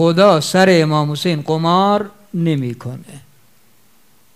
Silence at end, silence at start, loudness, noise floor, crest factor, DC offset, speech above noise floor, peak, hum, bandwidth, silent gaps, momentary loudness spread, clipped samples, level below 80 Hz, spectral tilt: 1.15 s; 0 s; -15 LUFS; -55 dBFS; 16 dB; 0.3%; 40 dB; 0 dBFS; none; 15.5 kHz; none; 15 LU; under 0.1%; -64 dBFS; -6 dB/octave